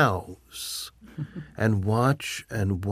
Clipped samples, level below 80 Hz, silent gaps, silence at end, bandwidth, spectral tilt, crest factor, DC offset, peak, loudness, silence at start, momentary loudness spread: under 0.1%; -54 dBFS; none; 0 s; 15.5 kHz; -5.5 dB/octave; 20 dB; under 0.1%; -8 dBFS; -28 LUFS; 0 s; 15 LU